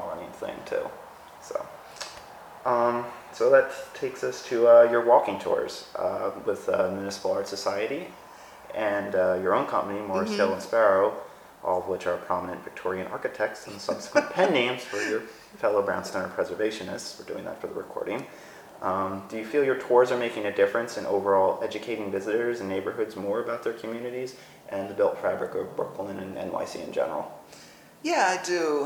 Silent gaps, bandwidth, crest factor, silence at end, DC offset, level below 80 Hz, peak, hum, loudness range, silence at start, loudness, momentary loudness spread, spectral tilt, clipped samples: none; 19.5 kHz; 22 dB; 0 s; under 0.1%; -68 dBFS; -6 dBFS; none; 8 LU; 0 s; -27 LUFS; 15 LU; -4.5 dB/octave; under 0.1%